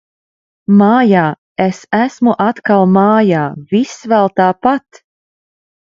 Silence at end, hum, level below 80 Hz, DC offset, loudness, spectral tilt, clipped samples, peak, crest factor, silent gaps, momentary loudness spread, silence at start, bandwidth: 1.1 s; none; -56 dBFS; under 0.1%; -12 LUFS; -7.5 dB/octave; under 0.1%; 0 dBFS; 12 dB; 1.38-1.56 s; 8 LU; 0.7 s; 7.4 kHz